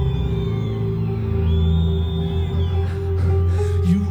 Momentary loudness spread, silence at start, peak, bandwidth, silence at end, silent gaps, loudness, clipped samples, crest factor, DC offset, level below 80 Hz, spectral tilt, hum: 4 LU; 0 s; -8 dBFS; 19.5 kHz; 0 s; none; -21 LUFS; under 0.1%; 12 dB; under 0.1%; -26 dBFS; -9 dB/octave; none